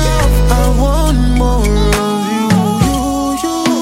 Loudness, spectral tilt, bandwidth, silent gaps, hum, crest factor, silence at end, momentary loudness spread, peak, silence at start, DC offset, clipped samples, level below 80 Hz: -13 LUFS; -5.5 dB/octave; 16 kHz; none; none; 12 dB; 0 s; 3 LU; 0 dBFS; 0 s; under 0.1%; under 0.1%; -16 dBFS